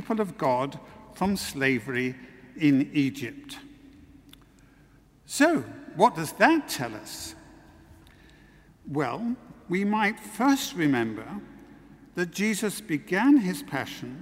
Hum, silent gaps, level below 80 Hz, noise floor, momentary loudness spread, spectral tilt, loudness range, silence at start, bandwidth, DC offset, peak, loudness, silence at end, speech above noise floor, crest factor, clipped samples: none; none; -60 dBFS; -57 dBFS; 17 LU; -5 dB/octave; 4 LU; 0 s; 16 kHz; under 0.1%; -4 dBFS; -26 LUFS; 0 s; 31 dB; 22 dB; under 0.1%